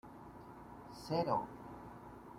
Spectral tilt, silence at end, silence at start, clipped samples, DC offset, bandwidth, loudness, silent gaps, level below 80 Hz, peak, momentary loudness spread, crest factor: -6.5 dB/octave; 0 s; 0.05 s; under 0.1%; under 0.1%; 16.5 kHz; -40 LUFS; none; -66 dBFS; -22 dBFS; 18 LU; 20 dB